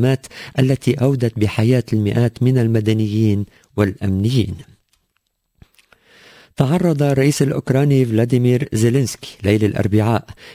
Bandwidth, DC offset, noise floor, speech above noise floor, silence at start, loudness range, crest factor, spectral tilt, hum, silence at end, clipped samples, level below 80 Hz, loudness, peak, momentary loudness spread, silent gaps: 16 kHz; under 0.1%; -70 dBFS; 53 dB; 0 s; 6 LU; 16 dB; -7 dB/octave; none; 0 s; under 0.1%; -42 dBFS; -17 LUFS; -2 dBFS; 7 LU; none